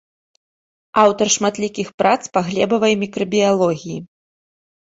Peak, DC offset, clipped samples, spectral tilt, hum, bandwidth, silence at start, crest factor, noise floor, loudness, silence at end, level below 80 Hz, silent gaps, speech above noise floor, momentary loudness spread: -2 dBFS; under 0.1%; under 0.1%; -4 dB/octave; none; 8 kHz; 0.95 s; 18 dB; under -90 dBFS; -17 LUFS; 0.8 s; -60 dBFS; 1.94-1.98 s; over 73 dB; 9 LU